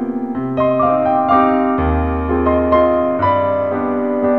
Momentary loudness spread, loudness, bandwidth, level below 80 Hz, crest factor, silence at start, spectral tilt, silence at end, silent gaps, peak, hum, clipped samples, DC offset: 5 LU; -15 LUFS; 4.6 kHz; -30 dBFS; 14 dB; 0 s; -10 dB/octave; 0 s; none; 0 dBFS; none; under 0.1%; 0.6%